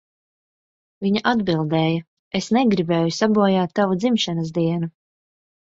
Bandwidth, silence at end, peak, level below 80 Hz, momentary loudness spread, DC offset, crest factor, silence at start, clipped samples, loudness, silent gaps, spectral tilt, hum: 8 kHz; 0.9 s; -4 dBFS; -58 dBFS; 9 LU; under 0.1%; 18 dB; 1 s; under 0.1%; -20 LUFS; 2.07-2.31 s; -6 dB/octave; none